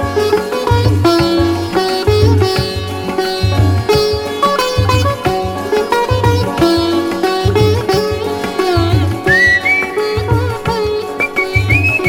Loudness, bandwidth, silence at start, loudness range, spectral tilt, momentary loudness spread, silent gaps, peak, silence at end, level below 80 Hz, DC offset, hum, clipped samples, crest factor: -13 LUFS; 17.5 kHz; 0 s; 1 LU; -6 dB/octave; 6 LU; none; 0 dBFS; 0 s; -30 dBFS; under 0.1%; none; under 0.1%; 12 dB